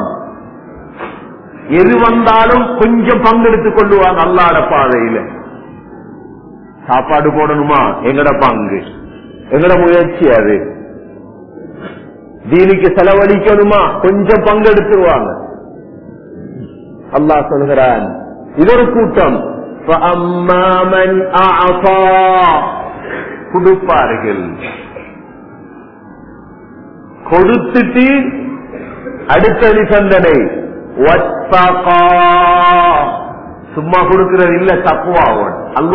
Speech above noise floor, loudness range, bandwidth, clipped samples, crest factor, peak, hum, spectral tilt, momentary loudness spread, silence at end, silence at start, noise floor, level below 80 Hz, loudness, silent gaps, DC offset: 25 dB; 6 LU; 5.4 kHz; 0.4%; 10 dB; 0 dBFS; none; -9 dB/octave; 19 LU; 0 s; 0 s; -34 dBFS; -32 dBFS; -9 LUFS; none; under 0.1%